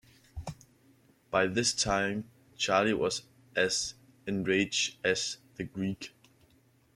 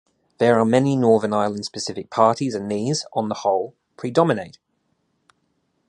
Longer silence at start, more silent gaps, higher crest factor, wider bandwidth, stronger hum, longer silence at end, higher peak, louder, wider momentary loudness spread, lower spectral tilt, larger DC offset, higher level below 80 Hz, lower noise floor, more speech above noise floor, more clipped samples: about the same, 0.35 s vs 0.4 s; neither; about the same, 20 dB vs 20 dB; first, 14.5 kHz vs 11 kHz; neither; second, 0.85 s vs 1.4 s; second, -12 dBFS vs -2 dBFS; second, -30 LUFS vs -21 LUFS; first, 17 LU vs 10 LU; second, -3 dB/octave vs -5.5 dB/octave; neither; about the same, -58 dBFS vs -62 dBFS; second, -65 dBFS vs -70 dBFS; second, 35 dB vs 50 dB; neither